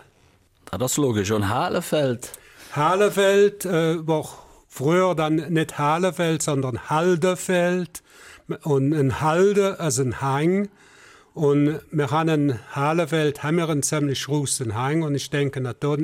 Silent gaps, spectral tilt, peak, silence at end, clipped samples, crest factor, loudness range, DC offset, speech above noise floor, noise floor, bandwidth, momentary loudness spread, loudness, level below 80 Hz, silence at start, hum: none; -5.5 dB/octave; -8 dBFS; 0 s; under 0.1%; 14 dB; 2 LU; under 0.1%; 37 dB; -58 dBFS; 16.5 kHz; 8 LU; -22 LUFS; -58 dBFS; 0.7 s; none